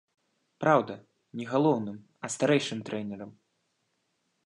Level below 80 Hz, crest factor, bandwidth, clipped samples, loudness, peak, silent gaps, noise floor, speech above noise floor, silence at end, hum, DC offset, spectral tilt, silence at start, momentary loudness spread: -76 dBFS; 22 dB; 11.5 kHz; under 0.1%; -28 LUFS; -8 dBFS; none; -77 dBFS; 49 dB; 1.15 s; none; under 0.1%; -5.5 dB/octave; 0.6 s; 18 LU